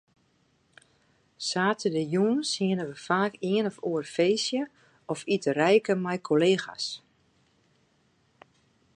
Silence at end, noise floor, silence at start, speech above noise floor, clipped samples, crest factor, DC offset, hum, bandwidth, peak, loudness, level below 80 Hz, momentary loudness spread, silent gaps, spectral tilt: 2 s; -68 dBFS; 1.4 s; 42 dB; under 0.1%; 20 dB; under 0.1%; none; 11 kHz; -8 dBFS; -27 LUFS; -76 dBFS; 11 LU; none; -5 dB/octave